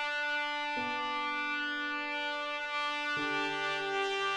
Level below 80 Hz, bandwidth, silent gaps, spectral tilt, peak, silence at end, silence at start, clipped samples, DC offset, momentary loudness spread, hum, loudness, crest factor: -72 dBFS; 13 kHz; none; -2 dB/octave; -18 dBFS; 0 s; 0 s; under 0.1%; under 0.1%; 2 LU; none; -33 LUFS; 16 dB